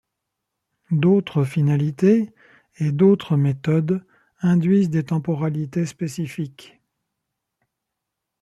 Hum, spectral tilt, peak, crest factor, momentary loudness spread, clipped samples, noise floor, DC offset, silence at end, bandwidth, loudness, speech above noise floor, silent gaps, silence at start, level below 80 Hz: none; -8.5 dB/octave; -6 dBFS; 16 dB; 10 LU; under 0.1%; -82 dBFS; under 0.1%; 1.8 s; 12 kHz; -21 LUFS; 62 dB; none; 0.9 s; -62 dBFS